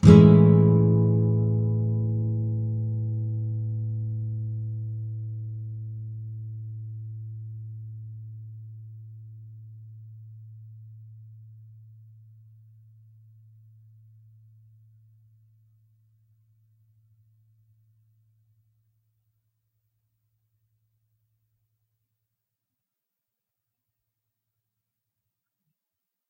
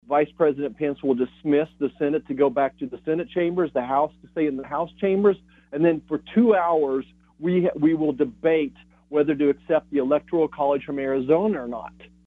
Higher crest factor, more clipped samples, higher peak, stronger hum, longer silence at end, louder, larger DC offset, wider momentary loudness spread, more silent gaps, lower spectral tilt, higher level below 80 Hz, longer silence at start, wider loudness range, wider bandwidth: first, 26 dB vs 18 dB; neither; first, -2 dBFS vs -6 dBFS; neither; first, 14.95 s vs 0.35 s; about the same, -24 LUFS vs -23 LUFS; neither; first, 27 LU vs 8 LU; neither; about the same, -10 dB/octave vs -9.5 dB/octave; first, -50 dBFS vs -58 dBFS; about the same, 0.05 s vs 0.1 s; first, 25 LU vs 2 LU; first, 7.8 kHz vs 4.3 kHz